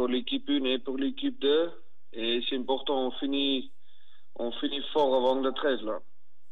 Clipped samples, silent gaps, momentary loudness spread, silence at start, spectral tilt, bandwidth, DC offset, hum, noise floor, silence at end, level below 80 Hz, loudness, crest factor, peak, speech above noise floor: under 0.1%; none; 10 LU; 0 s; -5.5 dB/octave; 6.4 kHz; 2%; none; -66 dBFS; 0.5 s; -86 dBFS; -29 LUFS; 16 dB; -14 dBFS; 37 dB